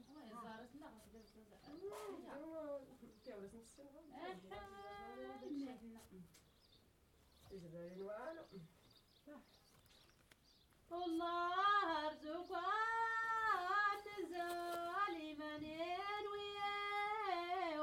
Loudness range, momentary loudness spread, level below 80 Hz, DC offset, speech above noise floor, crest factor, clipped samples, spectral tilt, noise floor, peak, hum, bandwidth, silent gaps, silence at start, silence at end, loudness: 17 LU; 22 LU; -76 dBFS; under 0.1%; 28 dB; 20 dB; under 0.1%; -4 dB/octave; -72 dBFS; -26 dBFS; none; 18 kHz; none; 0 s; 0 s; -44 LUFS